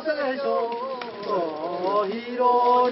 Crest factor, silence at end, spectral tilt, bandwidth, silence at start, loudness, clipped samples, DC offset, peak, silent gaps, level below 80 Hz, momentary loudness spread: 14 dB; 0 s; -9 dB/octave; 5.8 kHz; 0 s; -24 LUFS; under 0.1%; under 0.1%; -10 dBFS; none; -72 dBFS; 10 LU